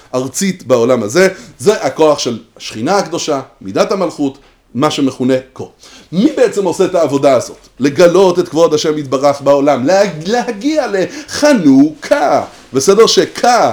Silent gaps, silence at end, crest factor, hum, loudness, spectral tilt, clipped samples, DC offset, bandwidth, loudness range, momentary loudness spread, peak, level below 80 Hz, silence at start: none; 0 s; 12 dB; none; -12 LUFS; -4.5 dB/octave; 0.4%; under 0.1%; over 20 kHz; 5 LU; 11 LU; 0 dBFS; -52 dBFS; 0.15 s